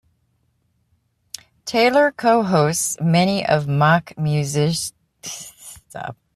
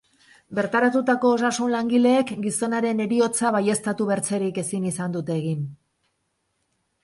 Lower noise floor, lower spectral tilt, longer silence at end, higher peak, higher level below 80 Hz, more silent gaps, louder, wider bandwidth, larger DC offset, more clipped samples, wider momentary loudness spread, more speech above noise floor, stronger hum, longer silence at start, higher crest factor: second, -66 dBFS vs -74 dBFS; about the same, -5 dB/octave vs -5 dB/octave; second, 0.2 s vs 1.3 s; first, -4 dBFS vs -8 dBFS; first, -58 dBFS vs -66 dBFS; neither; first, -18 LUFS vs -23 LUFS; first, 15 kHz vs 11.5 kHz; neither; neither; first, 20 LU vs 7 LU; about the same, 48 dB vs 51 dB; neither; first, 1.65 s vs 0.5 s; about the same, 18 dB vs 16 dB